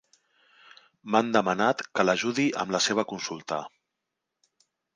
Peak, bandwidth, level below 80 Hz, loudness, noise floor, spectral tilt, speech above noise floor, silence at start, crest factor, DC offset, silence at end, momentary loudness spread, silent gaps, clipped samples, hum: -6 dBFS; 10.5 kHz; -72 dBFS; -26 LUFS; -84 dBFS; -3.5 dB/octave; 58 dB; 1.05 s; 24 dB; under 0.1%; 1.3 s; 11 LU; none; under 0.1%; none